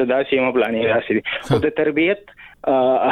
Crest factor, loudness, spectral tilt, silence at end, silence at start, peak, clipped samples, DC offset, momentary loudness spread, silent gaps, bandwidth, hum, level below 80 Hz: 14 dB; -19 LUFS; -7 dB/octave; 0 s; 0 s; -4 dBFS; under 0.1%; under 0.1%; 5 LU; none; 12.5 kHz; none; -50 dBFS